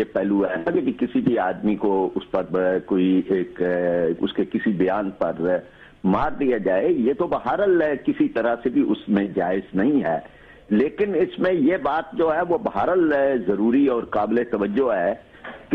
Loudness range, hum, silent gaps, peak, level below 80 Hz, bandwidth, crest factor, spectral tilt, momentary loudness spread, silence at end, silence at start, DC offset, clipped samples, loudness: 2 LU; none; none; -8 dBFS; -52 dBFS; 4.8 kHz; 12 dB; -9 dB/octave; 5 LU; 0 s; 0 s; under 0.1%; under 0.1%; -22 LUFS